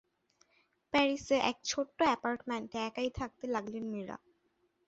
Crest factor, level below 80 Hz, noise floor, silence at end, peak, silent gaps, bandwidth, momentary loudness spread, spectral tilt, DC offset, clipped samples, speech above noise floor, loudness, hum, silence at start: 20 dB; -64 dBFS; -76 dBFS; 0.7 s; -16 dBFS; none; 8 kHz; 10 LU; -2 dB/octave; under 0.1%; under 0.1%; 42 dB; -34 LUFS; none; 0.95 s